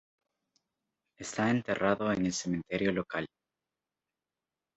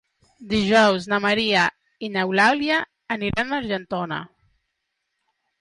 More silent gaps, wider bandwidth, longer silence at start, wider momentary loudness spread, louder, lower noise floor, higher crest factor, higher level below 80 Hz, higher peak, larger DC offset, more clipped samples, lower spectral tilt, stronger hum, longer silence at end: neither; second, 8.2 kHz vs 11.5 kHz; first, 1.2 s vs 0.4 s; about the same, 10 LU vs 11 LU; second, -32 LUFS vs -21 LUFS; first, under -90 dBFS vs -77 dBFS; first, 22 dB vs 16 dB; second, -64 dBFS vs -52 dBFS; second, -12 dBFS vs -6 dBFS; neither; neither; about the same, -5 dB/octave vs -4.5 dB/octave; neither; first, 1.5 s vs 1.35 s